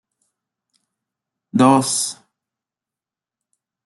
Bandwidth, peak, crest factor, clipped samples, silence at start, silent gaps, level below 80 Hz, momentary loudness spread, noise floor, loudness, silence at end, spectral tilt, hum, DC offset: 12.5 kHz; -2 dBFS; 22 dB; under 0.1%; 1.55 s; none; -66 dBFS; 13 LU; -89 dBFS; -17 LUFS; 1.75 s; -4.5 dB/octave; none; under 0.1%